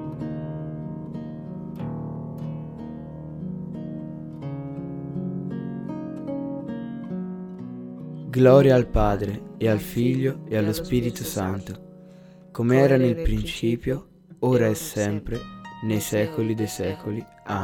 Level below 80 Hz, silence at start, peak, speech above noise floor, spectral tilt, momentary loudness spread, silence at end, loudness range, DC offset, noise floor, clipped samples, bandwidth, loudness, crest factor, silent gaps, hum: -40 dBFS; 0 s; -4 dBFS; 25 dB; -6.5 dB/octave; 16 LU; 0 s; 13 LU; under 0.1%; -47 dBFS; under 0.1%; 18 kHz; -25 LUFS; 22 dB; none; none